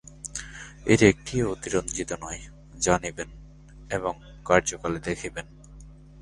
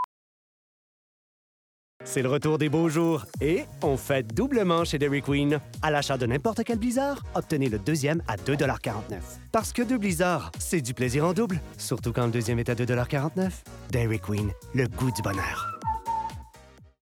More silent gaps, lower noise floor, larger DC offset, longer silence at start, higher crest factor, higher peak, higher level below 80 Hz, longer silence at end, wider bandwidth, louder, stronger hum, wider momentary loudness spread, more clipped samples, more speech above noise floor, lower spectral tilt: second, none vs 0.04-2.00 s; second, -47 dBFS vs -52 dBFS; neither; about the same, 0.1 s vs 0 s; first, 24 dB vs 16 dB; first, -2 dBFS vs -10 dBFS; about the same, -46 dBFS vs -46 dBFS; second, 0 s vs 0.15 s; second, 11.5 kHz vs 19 kHz; about the same, -26 LUFS vs -27 LUFS; neither; first, 19 LU vs 7 LU; neither; second, 22 dB vs 26 dB; about the same, -4.5 dB/octave vs -5.5 dB/octave